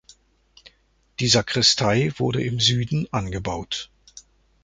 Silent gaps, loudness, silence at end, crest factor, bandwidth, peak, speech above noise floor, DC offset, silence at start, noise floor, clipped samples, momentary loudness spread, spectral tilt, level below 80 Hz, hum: none; -21 LUFS; 0.45 s; 20 dB; 9.4 kHz; -4 dBFS; 40 dB; under 0.1%; 0.65 s; -62 dBFS; under 0.1%; 14 LU; -4 dB/octave; -46 dBFS; none